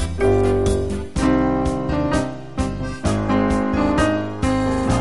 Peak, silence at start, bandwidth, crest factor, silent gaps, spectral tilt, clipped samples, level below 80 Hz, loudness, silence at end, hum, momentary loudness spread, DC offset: -6 dBFS; 0 s; 11.5 kHz; 14 dB; none; -6.5 dB/octave; under 0.1%; -30 dBFS; -20 LUFS; 0 s; none; 7 LU; 1%